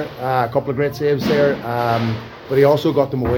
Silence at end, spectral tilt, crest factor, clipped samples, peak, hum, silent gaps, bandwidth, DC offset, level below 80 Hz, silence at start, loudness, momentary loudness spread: 0 s; -7.5 dB/octave; 16 dB; under 0.1%; -2 dBFS; none; none; 17 kHz; under 0.1%; -44 dBFS; 0 s; -18 LUFS; 7 LU